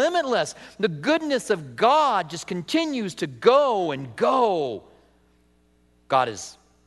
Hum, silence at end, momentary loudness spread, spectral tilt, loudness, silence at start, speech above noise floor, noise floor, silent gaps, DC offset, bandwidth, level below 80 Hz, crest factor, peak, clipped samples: none; 0.35 s; 12 LU; -4.5 dB/octave; -23 LUFS; 0 s; 38 dB; -61 dBFS; none; under 0.1%; 12 kHz; -64 dBFS; 22 dB; -2 dBFS; under 0.1%